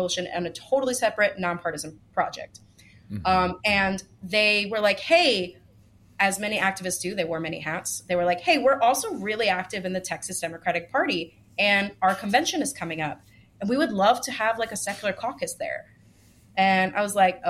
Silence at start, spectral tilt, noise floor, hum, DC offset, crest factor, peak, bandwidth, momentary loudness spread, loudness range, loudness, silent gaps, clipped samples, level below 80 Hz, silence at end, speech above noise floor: 0 s; -3 dB/octave; -55 dBFS; none; under 0.1%; 20 dB; -6 dBFS; 16 kHz; 11 LU; 4 LU; -24 LUFS; none; under 0.1%; -56 dBFS; 0 s; 31 dB